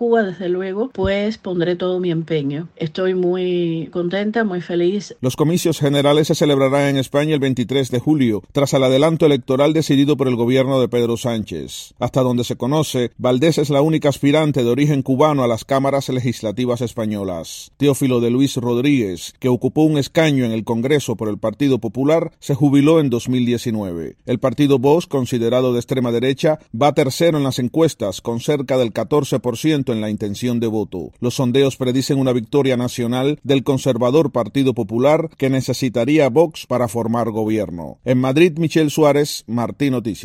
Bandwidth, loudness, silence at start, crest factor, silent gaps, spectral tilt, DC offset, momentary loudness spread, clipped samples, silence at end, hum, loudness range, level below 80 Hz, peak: 16 kHz; -18 LUFS; 0 s; 16 dB; none; -6 dB/octave; under 0.1%; 8 LU; under 0.1%; 0 s; none; 3 LU; -50 dBFS; 0 dBFS